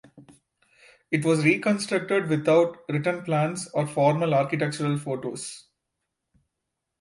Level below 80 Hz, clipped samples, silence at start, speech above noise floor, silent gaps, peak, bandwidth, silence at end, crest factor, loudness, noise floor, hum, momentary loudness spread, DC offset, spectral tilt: -70 dBFS; under 0.1%; 0.15 s; 59 dB; none; -8 dBFS; 11.5 kHz; 1.4 s; 18 dB; -24 LUFS; -83 dBFS; none; 10 LU; under 0.1%; -6 dB/octave